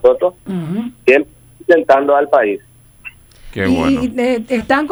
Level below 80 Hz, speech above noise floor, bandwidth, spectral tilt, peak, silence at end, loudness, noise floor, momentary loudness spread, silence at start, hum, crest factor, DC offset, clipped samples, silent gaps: -42 dBFS; 24 dB; over 20 kHz; -6.5 dB/octave; 0 dBFS; 0 s; -14 LUFS; -38 dBFS; 19 LU; 0.05 s; none; 14 dB; under 0.1%; under 0.1%; none